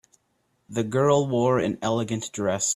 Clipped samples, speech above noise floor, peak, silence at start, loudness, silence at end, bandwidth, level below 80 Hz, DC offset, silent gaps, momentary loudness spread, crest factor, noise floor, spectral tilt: under 0.1%; 47 dB; -6 dBFS; 0.7 s; -24 LUFS; 0 s; 14 kHz; -60 dBFS; under 0.1%; none; 9 LU; 18 dB; -71 dBFS; -5 dB/octave